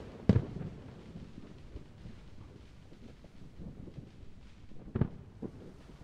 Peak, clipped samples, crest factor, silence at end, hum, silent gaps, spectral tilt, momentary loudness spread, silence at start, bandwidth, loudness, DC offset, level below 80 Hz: -10 dBFS; under 0.1%; 30 dB; 0 s; none; none; -9 dB/octave; 23 LU; 0 s; 9 kHz; -38 LUFS; under 0.1%; -52 dBFS